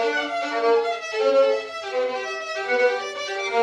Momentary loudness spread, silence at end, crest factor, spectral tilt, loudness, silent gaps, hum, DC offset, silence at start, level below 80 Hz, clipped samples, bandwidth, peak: 9 LU; 0 s; 14 dB; -1 dB/octave; -23 LUFS; none; none; under 0.1%; 0 s; -80 dBFS; under 0.1%; 10 kHz; -8 dBFS